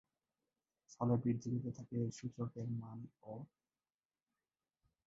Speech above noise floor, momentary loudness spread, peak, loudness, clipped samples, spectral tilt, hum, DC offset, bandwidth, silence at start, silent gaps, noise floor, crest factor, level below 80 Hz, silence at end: over 49 dB; 16 LU; -24 dBFS; -41 LUFS; under 0.1%; -10 dB/octave; none; under 0.1%; 7.6 kHz; 0.9 s; none; under -90 dBFS; 20 dB; -74 dBFS; 1.6 s